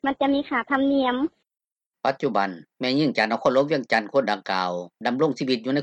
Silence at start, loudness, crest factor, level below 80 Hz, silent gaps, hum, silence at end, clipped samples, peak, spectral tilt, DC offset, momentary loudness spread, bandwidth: 0.05 s; -24 LUFS; 18 dB; -64 dBFS; 1.86-1.91 s; none; 0 s; under 0.1%; -6 dBFS; -6 dB/octave; under 0.1%; 7 LU; 8.6 kHz